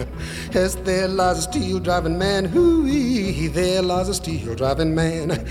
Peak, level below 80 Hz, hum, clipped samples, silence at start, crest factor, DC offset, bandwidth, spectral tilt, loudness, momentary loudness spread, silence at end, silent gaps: -6 dBFS; -34 dBFS; none; under 0.1%; 0 s; 14 dB; under 0.1%; 16.5 kHz; -5.5 dB/octave; -21 LUFS; 7 LU; 0 s; none